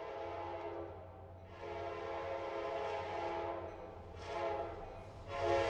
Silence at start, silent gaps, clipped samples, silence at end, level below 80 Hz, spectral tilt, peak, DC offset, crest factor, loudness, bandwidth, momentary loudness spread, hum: 0 s; none; under 0.1%; 0 s; -60 dBFS; -6 dB/octave; -22 dBFS; under 0.1%; 20 dB; -43 LUFS; 9.6 kHz; 11 LU; none